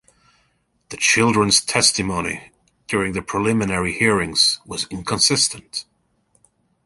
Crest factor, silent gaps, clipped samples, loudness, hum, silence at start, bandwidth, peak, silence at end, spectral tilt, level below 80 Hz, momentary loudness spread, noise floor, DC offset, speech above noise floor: 20 dB; none; under 0.1%; -18 LUFS; none; 0.9 s; 12 kHz; -2 dBFS; 1.05 s; -2.5 dB/octave; -48 dBFS; 13 LU; -65 dBFS; under 0.1%; 46 dB